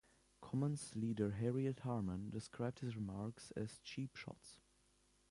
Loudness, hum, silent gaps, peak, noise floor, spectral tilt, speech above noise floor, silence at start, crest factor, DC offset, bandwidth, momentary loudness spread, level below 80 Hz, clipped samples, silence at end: -44 LUFS; none; none; -26 dBFS; -75 dBFS; -7 dB/octave; 32 dB; 0.4 s; 18 dB; under 0.1%; 11.5 kHz; 12 LU; -68 dBFS; under 0.1%; 0.75 s